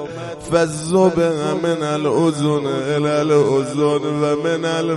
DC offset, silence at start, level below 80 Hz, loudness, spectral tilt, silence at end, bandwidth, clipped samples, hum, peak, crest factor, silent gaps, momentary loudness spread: under 0.1%; 0 s; -52 dBFS; -18 LUFS; -6 dB/octave; 0 s; 11.5 kHz; under 0.1%; none; -2 dBFS; 16 dB; none; 5 LU